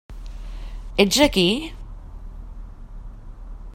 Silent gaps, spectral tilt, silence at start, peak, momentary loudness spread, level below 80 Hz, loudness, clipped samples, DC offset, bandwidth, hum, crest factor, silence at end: none; -3.5 dB/octave; 0.1 s; 0 dBFS; 26 LU; -34 dBFS; -19 LUFS; under 0.1%; under 0.1%; 16 kHz; none; 24 dB; 0 s